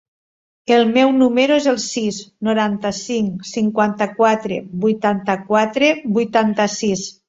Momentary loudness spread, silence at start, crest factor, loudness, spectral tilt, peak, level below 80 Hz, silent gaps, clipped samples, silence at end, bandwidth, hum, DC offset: 8 LU; 0.7 s; 16 dB; -17 LUFS; -4.5 dB/octave; -2 dBFS; -58 dBFS; none; under 0.1%; 0.15 s; 8 kHz; none; under 0.1%